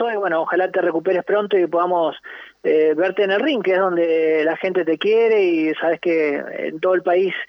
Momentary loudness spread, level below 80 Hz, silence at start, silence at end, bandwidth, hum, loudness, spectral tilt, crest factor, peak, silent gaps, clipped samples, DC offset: 6 LU; -74 dBFS; 0 s; 0.05 s; 6 kHz; none; -19 LUFS; -7 dB/octave; 12 dB; -6 dBFS; none; under 0.1%; under 0.1%